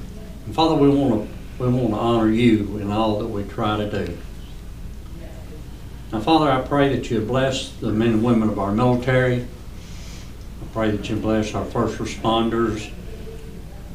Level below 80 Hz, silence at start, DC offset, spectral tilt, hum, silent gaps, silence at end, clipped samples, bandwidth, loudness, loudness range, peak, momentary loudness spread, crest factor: -36 dBFS; 0 s; 0.7%; -6.5 dB/octave; none; none; 0 s; under 0.1%; 15.5 kHz; -21 LUFS; 5 LU; -4 dBFS; 20 LU; 18 dB